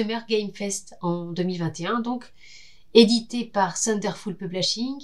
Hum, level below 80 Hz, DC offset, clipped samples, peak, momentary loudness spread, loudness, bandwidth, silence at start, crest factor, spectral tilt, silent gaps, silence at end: none; -60 dBFS; 0.5%; under 0.1%; 0 dBFS; 12 LU; -24 LUFS; 12.5 kHz; 0 s; 24 dB; -4 dB/octave; none; 0 s